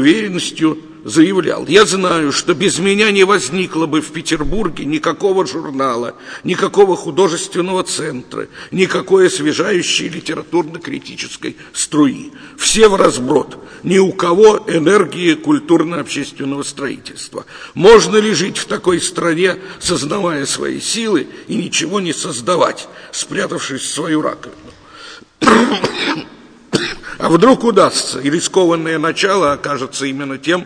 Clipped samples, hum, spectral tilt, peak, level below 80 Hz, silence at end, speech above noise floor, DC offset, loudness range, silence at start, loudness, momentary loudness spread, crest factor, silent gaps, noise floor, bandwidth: 0.2%; none; -4 dB/octave; 0 dBFS; -40 dBFS; 0 s; 22 dB; under 0.1%; 5 LU; 0 s; -14 LUFS; 14 LU; 14 dB; none; -36 dBFS; 10.5 kHz